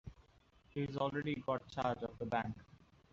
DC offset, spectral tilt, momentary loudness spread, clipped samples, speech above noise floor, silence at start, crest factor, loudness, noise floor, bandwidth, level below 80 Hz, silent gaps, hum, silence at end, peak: under 0.1%; -5 dB/octave; 9 LU; under 0.1%; 29 dB; 0.05 s; 18 dB; -40 LUFS; -68 dBFS; 7.6 kHz; -64 dBFS; none; none; 0.5 s; -22 dBFS